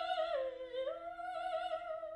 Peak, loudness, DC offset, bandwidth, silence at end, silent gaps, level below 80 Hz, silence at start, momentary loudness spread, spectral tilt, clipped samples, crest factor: -26 dBFS; -41 LUFS; under 0.1%; 11 kHz; 0 s; none; -72 dBFS; 0 s; 6 LU; -3 dB/octave; under 0.1%; 14 dB